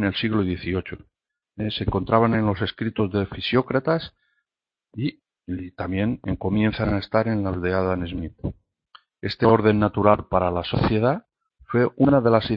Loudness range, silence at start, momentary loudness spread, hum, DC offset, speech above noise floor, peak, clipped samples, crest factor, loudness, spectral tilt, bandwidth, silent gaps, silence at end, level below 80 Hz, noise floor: 5 LU; 0 s; 13 LU; none; under 0.1%; 67 dB; -2 dBFS; under 0.1%; 22 dB; -23 LUFS; -10 dB/octave; 5.6 kHz; none; 0 s; -44 dBFS; -89 dBFS